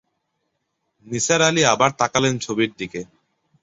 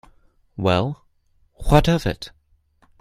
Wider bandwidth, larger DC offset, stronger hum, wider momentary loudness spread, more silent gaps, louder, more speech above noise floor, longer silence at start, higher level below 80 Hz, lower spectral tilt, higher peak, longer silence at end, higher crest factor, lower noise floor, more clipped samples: second, 8.2 kHz vs 15.5 kHz; neither; neither; second, 15 LU vs 22 LU; neither; about the same, -19 LUFS vs -20 LUFS; first, 55 dB vs 43 dB; first, 1.05 s vs 0.6 s; second, -58 dBFS vs -32 dBFS; second, -3 dB/octave vs -6.5 dB/octave; about the same, -2 dBFS vs 0 dBFS; about the same, 0.6 s vs 0.7 s; about the same, 20 dB vs 22 dB; first, -74 dBFS vs -61 dBFS; neither